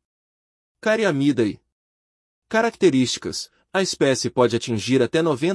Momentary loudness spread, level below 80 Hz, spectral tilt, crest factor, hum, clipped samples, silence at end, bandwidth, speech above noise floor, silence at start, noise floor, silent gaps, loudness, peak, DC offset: 8 LU; -64 dBFS; -4.5 dB/octave; 18 dB; none; under 0.1%; 0 s; 12 kHz; over 70 dB; 0.85 s; under -90 dBFS; 1.72-2.42 s; -21 LUFS; -4 dBFS; under 0.1%